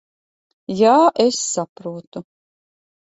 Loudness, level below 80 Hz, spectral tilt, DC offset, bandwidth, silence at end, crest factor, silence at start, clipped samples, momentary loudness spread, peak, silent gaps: -16 LUFS; -66 dBFS; -4 dB/octave; under 0.1%; 8.2 kHz; 0.85 s; 18 dB; 0.7 s; under 0.1%; 23 LU; -2 dBFS; 1.69-1.76 s, 2.07-2.12 s